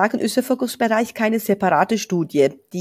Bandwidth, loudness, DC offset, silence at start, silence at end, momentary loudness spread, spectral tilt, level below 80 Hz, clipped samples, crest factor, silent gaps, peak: 16 kHz; -20 LUFS; under 0.1%; 0 s; 0 s; 4 LU; -5 dB/octave; -64 dBFS; under 0.1%; 18 dB; none; -2 dBFS